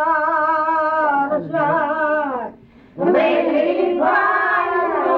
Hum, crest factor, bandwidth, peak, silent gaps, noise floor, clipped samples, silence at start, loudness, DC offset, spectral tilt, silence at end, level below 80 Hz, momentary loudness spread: none; 12 dB; 5.8 kHz; -6 dBFS; none; -42 dBFS; under 0.1%; 0 s; -18 LUFS; under 0.1%; -7.5 dB/octave; 0 s; -58 dBFS; 5 LU